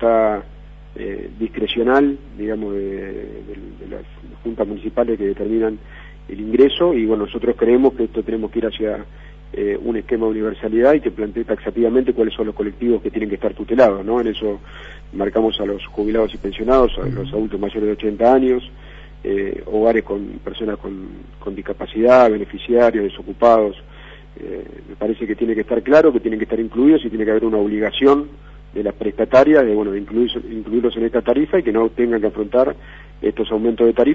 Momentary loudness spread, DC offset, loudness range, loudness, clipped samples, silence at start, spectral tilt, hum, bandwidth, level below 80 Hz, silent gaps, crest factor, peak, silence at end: 17 LU; under 0.1%; 5 LU; -18 LUFS; under 0.1%; 0 s; -7.5 dB/octave; 50 Hz at -40 dBFS; 7.2 kHz; -38 dBFS; none; 16 dB; -2 dBFS; 0 s